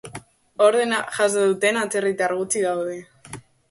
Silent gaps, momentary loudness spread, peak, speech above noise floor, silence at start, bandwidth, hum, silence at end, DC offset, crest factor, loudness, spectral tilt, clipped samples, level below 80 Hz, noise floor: none; 22 LU; -4 dBFS; 21 dB; 0.05 s; 12 kHz; none; 0.3 s; under 0.1%; 18 dB; -21 LUFS; -3 dB/octave; under 0.1%; -64 dBFS; -42 dBFS